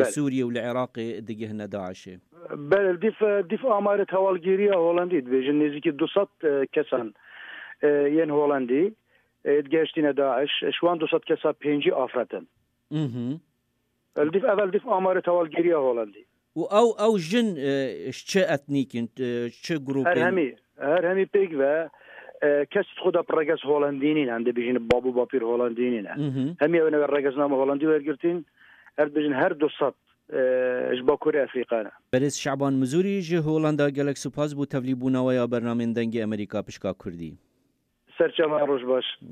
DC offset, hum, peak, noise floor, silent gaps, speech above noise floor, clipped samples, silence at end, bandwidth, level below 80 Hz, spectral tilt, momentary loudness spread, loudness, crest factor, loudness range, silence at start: under 0.1%; none; -6 dBFS; -73 dBFS; none; 49 dB; under 0.1%; 0 s; 12 kHz; -66 dBFS; -6 dB/octave; 10 LU; -25 LUFS; 18 dB; 4 LU; 0 s